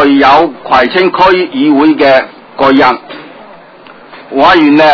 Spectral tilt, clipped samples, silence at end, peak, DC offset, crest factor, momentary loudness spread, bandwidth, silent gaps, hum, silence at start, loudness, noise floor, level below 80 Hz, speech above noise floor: -6 dB/octave; 3%; 0 s; 0 dBFS; under 0.1%; 8 dB; 13 LU; 6 kHz; none; none; 0 s; -7 LUFS; -34 dBFS; -42 dBFS; 28 dB